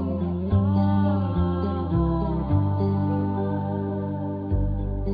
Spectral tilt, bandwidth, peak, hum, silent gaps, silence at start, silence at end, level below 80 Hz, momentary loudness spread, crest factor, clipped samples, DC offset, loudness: -12.5 dB/octave; 4.9 kHz; -10 dBFS; none; none; 0 s; 0 s; -34 dBFS; 6 LU; 14 dB; under 0.1%; under 0.1%; -25 LUFS